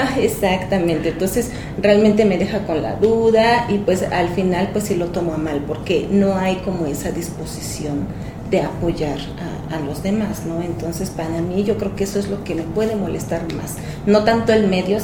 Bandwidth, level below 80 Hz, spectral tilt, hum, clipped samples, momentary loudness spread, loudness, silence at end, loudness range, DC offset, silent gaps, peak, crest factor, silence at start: 19 kHz; -38 dBFS; -6 dB/octave; none; under 0.1%; 11 LU; -19 LUFS; 0 s; 7 LU; under 0.1%; none; 0 dBFS; 18 dB; 0 s